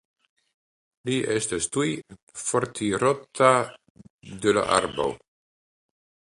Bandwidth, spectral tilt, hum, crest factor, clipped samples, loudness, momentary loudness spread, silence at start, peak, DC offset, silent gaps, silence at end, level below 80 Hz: 11.5 kHz; -4 dB/octave; none; 24 dB; under 0.1%; -24 LUFS; 16 LU; 1.05 s; -4 dBFS; under 0.1%; 2.23-2.27 s, 3.90-3.95 s, 4.10-4.19 s; 1.25 s; -58 dBFS